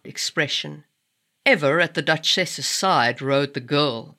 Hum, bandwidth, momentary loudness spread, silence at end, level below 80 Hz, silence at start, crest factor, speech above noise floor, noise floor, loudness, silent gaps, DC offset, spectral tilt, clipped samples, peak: none; 16 kHz; 5 LU; 0.05 s; -82 dBFS; 0.05 s; 18 dB; 52 dB; -73 dBFS; -20 LUFS; none; under 0.1%; -3 dB/octave; under 0.1%; -4 dBFS